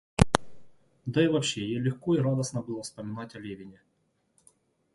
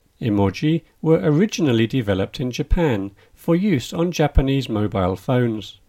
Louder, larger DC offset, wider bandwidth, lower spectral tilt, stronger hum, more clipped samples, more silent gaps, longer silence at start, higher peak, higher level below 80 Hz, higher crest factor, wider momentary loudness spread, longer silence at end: second, -29 LUFS vs -20 LUFS; neither; second, 11.5 kHz vs 16 kHz; second, -5.5 dB/octave vs -7 dB/octave; neither; neither; neither; about the same, 0.2 s vs 0.2 s; about the same, 0 dBFS vs -2 dBFS; second, -46 dBFS vs -30 dBFS; first, 30 dB vs 18 dB; first, 16 LU vs 5 LU; first, 1.2 s vs 0.15 s